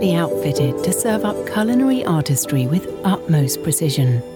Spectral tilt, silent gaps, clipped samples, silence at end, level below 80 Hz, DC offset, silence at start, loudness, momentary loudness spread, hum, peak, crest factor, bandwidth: -5.5 dB/octave; none; under 0.1%; 0 s; -50 dBFS; under 0.1%; 0 s; -18 LUFS; 4 LU; none; -6 dBFS; 12 dB; 18.5 kHz